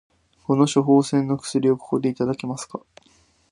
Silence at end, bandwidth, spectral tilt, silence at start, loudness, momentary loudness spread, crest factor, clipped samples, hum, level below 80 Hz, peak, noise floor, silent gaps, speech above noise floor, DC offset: 0.75 s; 11 kHz; -6.5 dB/octave; 0.5 s; -21 LUFS; 16 LU; 18 dB; under 0.1%; none; -62 dBFS; -4 dBFS; -59 dBFS; none; 38 dB; under 0.1%